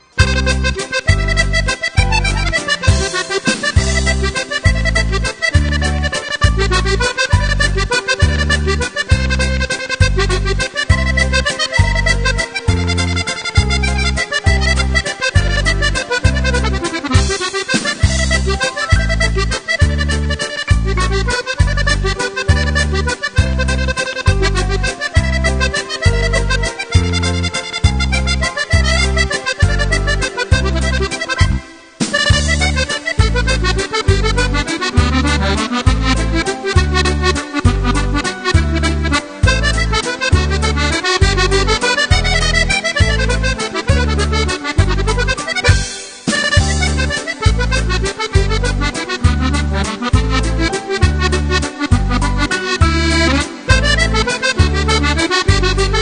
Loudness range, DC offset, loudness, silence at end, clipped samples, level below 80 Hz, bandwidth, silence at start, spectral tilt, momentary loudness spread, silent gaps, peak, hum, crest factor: 2 LU; under 0.1%; -15 LUFS; 0 s; under 0.1%; -18 dBFS; 10 kHz; 0.15 s; -4 dB/octave; 4 LU; none; 0 dBFS; none; 14 dB